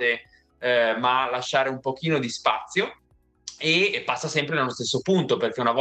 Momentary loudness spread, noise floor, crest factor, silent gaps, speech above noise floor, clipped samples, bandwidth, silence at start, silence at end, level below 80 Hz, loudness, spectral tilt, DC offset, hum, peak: 7 LU; -45 dBFS; 18 dB; none; 21 dB; under 0.1%; 9 kHz; 0 s; 0 s; -66 dBFS; -24 LUFS; -4 dB/octave; under 0.1%; none; -6 dBFS